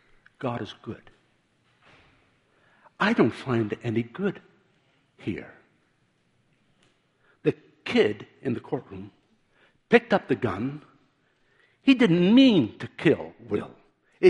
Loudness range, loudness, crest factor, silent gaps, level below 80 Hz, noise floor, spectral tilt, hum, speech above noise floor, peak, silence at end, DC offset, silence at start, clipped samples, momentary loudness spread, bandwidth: 13 LU; -25 LUFS; 24 dB; none; -64 dBFS; -68 dBFS; -7 dB/octave; none; 44 dB; -2 dBFS; 0 s; under 0.1%; 0.4 s; under 0.1%; 18 LU; 9 kHz